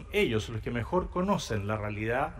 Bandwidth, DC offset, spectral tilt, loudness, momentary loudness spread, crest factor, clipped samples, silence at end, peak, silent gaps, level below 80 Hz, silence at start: 16 kHz; under 0.1%; -6 dB/octave; -31 LUFS; 5 LU; 16 dB; under 0.1%; 0 s; -14 dBFS; none; -44 dBFS; 0 s